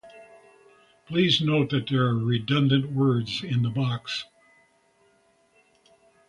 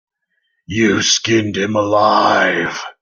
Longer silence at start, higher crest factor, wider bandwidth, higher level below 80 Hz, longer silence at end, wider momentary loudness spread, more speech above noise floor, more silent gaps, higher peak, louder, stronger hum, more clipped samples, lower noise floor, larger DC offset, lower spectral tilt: second, 0.05 s vs 0.7 s; about the same, 18 dB vs 16 dB; first, 10.5 kHz vs 7.4 kHz; about the same, -60 dBFS vs -56 dBFS; first, 2.05 s vs 0.1 s; about the same, 9 LU vs 7 LU; second, 40 dB vs 53 dB; neither; second, -8 dBFS vs 0 dBFS; second, -24 LUFS vs -14 LUFS; neither; neither; second, -64 dBFS vs -68 dBFS; neither; first, -6.5 dB/octave vs -3.5 dB/octave